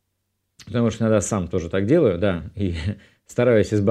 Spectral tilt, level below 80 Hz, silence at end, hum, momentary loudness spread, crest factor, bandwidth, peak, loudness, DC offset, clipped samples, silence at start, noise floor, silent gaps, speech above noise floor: -6.5 dB/octave; -44 dBFS; 0 s; none; 11 LU; 16 dB; 12.5 kHz; -6 dBFS; -21 LUFS; under 0.1%; under 0.1%; 0.6 s; -74 dBFS; none; 54 dB